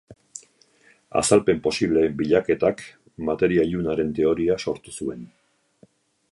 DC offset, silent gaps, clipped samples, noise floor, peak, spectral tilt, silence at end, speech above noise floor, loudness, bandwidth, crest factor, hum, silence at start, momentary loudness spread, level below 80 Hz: under 0.1%; none; under 0.1%; -58 dBFS; -2 dBFS; -5 dB/octave; 1.05 s; 36 dB; -22 LUFS; 11.5 kHz; 22 dB; none; 0.1 s; 22 LU; -50 dBFS